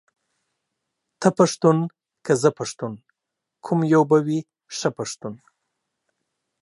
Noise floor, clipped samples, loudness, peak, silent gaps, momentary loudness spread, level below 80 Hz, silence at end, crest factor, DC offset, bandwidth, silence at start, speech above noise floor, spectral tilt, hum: -83 dBFS; under 0.1%; -21 LUFS; -2 dBFS; none; 17 LU; -70 dBFS; 1.25 s; 22 dB; under 0.1%; 11.5 kHz; 1.2 s; 63 dB; -6 dB/octave; none